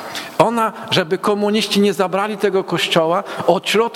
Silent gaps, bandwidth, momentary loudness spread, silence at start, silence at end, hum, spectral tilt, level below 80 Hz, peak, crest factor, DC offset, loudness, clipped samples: none; 16.5 kHz; 3 LU; 0 s; 0 s; none; -4.5 dB/octave; -60 dBFS; 0 dBFS; 18 dB; under 0.1%; -17 LUFS; under 0.1%